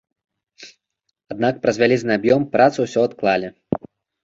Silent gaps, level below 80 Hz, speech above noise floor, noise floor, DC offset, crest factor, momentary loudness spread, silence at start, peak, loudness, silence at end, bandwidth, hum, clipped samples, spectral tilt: none; -58 dBFS; 55 dB; -73 dBFS; under 0.1%; 18 dB; 11 LU; 0.6 s; -2 dBFS; -19 LUFS; 0.45 s; 7.8 kHz; none; under 0.1%; -6 dB/octave